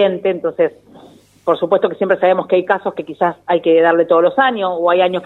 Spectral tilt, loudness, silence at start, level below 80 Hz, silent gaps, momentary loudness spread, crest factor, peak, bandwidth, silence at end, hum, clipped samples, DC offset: -7.5 dB/octave; -15 LUFS; 0 s; -64 dBFS; none; 7 LU; 14 dB; 0 dBFS; 4.1 kHz; 0 s; none; under 0.1%; under 0.1%